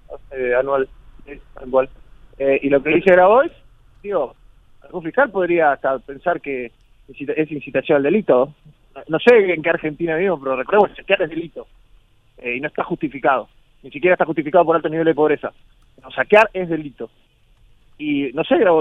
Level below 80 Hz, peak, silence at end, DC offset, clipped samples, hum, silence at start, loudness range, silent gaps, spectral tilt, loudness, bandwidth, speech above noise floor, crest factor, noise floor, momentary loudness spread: -50 dBFS; 0 dBFS; 0 s; under 0.1%; under 0.1%; none; 0.1 s; 4 LU; none; -7.5 dB/octave; -18 LUFS; 7 kHz; 35 dB; 18 dB; -53 dBFS; 17 LU